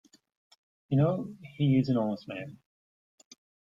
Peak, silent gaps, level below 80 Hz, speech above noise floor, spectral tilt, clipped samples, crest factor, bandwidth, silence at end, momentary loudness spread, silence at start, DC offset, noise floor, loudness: -14 dBFS; none; -66 dBFS; over 62 dB; -9 dB/octave; under 0.1%; 18 dB; 7.4 kHz; 1.2 s; 15 LU; 0.9 s; under 0.1%; under -90 dBFS; -29 LUFS